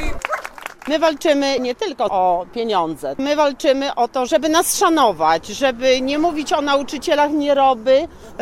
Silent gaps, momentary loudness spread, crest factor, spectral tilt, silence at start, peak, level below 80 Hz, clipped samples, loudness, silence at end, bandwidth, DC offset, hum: none; 8 LU; 14 dB; -3 dB/octave; 0 s; -2 dBFS; -40 dBFS; under 0.1%; -18 LUFS; 0 s; 16 kHz; under 0.1%; none